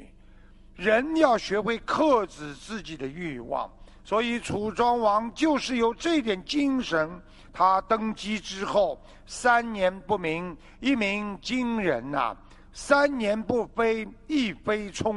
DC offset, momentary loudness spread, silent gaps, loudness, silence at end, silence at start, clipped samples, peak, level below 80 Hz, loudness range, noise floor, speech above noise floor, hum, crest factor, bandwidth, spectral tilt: under 0.1%; 13 LU; none; -26 LUFS; 0 s; 0 s; under 0.1%; -4 dBFS; -50 dBFS; 2 LU; -51 dBFS; 25 dB; none; 22 dB; 11.5 kHz; -4.5 dB/octave